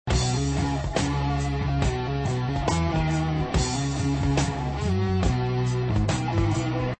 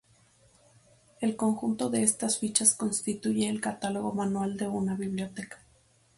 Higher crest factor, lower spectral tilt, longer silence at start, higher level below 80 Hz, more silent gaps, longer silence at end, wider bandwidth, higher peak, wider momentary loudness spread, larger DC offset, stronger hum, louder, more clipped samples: second, 14 dB vs 22 dB; first, -6 dB/octave vs -4 dB/octave; second, 0.05 s vs 1.2 s; first, -32 dBFS vs -66 dBFS; neither; second, 0.05 s vs 0.6 s; second, 8.8 kHz vs 12 kHz; about the same, -10 dBFS vs -8 dBFS; second, 2 LU vs 10 LU; first, 0.3% vs under 0.1%; neither; first, -25 LUFS vs -28 LUFS; neither